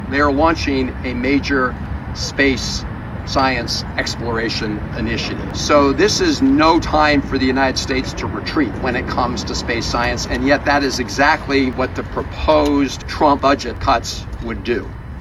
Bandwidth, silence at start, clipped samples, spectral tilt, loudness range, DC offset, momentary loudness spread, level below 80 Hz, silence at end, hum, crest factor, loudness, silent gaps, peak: 13.5 kHz; 0 s; under 0.1%; -4.5 dB/octave; 4 LU; under 0.1%; 9 LU; -30 dBFS; 0 s; none; 16 dB; -17 LUFS; none; 0 dBFS